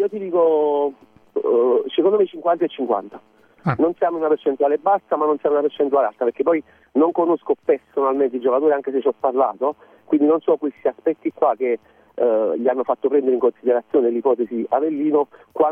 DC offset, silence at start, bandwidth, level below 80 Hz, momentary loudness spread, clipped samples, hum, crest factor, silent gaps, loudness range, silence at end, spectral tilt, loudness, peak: under 0.1%; 0 s; 3.7 kHz; -68 dBFS; 6 LU; under 0.1%; none; 14 dB; none; 1 LU; 0 s; -9.5 dB/octave; -20 LUFS; -4 dBFS